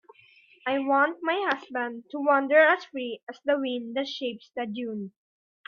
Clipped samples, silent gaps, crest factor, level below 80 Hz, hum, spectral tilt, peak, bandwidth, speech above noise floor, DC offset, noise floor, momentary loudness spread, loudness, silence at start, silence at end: under 0.1%; 3.23-3.27 s; 20 dB; -80 dBFS; none; -5 dB/octave; -8 dBFS; 6.8 kHz; 31 dB; under 0.1%; -58 dBFS; 15 LU; -26 LUFS; 0.65 s; 0.6 s